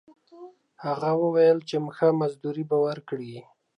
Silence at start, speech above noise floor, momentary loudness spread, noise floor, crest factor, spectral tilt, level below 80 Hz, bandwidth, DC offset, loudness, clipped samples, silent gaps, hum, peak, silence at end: 0.35 s; 24 dB; 15 LU; -48 dBFS; 16 dB; -7.5 dB/octave; -80 dBFS; 9.6 kHz; under 0.1%; -25 LUFS; under 0.1%; none; none; -10 dBFS; 0.35 s